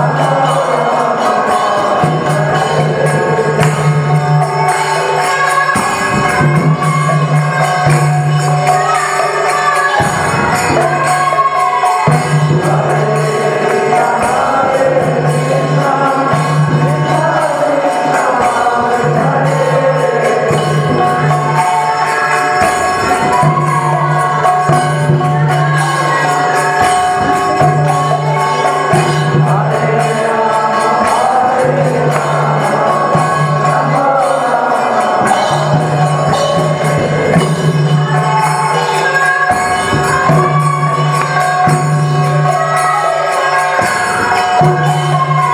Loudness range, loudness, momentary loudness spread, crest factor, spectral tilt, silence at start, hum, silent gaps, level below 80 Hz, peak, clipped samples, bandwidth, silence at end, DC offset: 1 LU; -11 LUFS; 2 LU; 10 dB; -5.5 dB/octave; 0 s; none; none; -44 dBFS; 0 dBFS; under 0.1%; 14.5 kHz; 0 s; under 0.1%